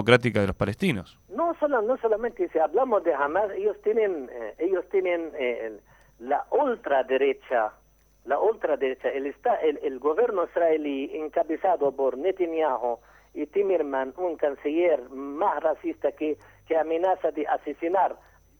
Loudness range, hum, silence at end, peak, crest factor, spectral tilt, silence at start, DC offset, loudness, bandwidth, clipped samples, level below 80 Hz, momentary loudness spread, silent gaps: 2 LU; none; 0.45 s; -4 dBFS; 22 dB; -7 dB/octave; 0 s; under 0.1%; -26 LUFS; 15.5 kHz; under 0.1%; -58 dBFS; 7 LU; none